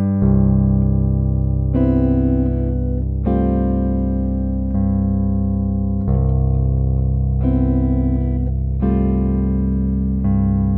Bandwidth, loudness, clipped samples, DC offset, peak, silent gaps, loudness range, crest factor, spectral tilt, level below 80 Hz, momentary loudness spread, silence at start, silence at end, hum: 2.6 kHz; -18 LUFS; under 0.1%; under 0.1%; -4 dBFS; none; 2 LU; 12 dB; -14 dB/octave; -22 dBFS; 5 LU; 0 s; 0 s; none